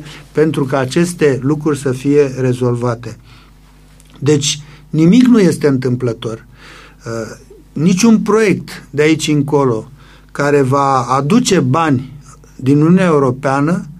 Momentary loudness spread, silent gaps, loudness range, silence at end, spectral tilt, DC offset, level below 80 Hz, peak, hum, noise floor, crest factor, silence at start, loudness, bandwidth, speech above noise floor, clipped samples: 14 LU; none; 3 LU; 0 s; -6 dB/octave; under 0.1%; -44 dBFS; 0 dBFS; none; -42 dBFS; 14 dB; 0 s; -13 LUFS; 14 kHz; 30 dB; under 0.1%